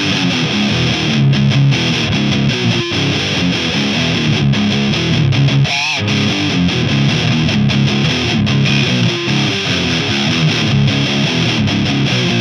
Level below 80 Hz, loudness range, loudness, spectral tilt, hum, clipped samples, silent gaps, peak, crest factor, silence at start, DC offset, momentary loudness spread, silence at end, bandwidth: -38 dBFS; 0 LU; -13 LUFS; -5 dB/octave; none; under 0.1%; none; 0 dBFS; 12 dB; 0 s; under 0.1%; 2 LU; 0 s; 9.8 kHz